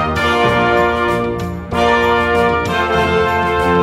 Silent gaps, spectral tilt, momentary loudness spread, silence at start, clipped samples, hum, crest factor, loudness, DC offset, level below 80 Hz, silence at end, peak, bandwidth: none; -5.5 dB/octave; 5 LU; 0 s; under 0.1%; none; 14 dB; -14 LUFS; under 0.1%; -32 dBFS; 0 s; 0 dBFS; 15.5 kHz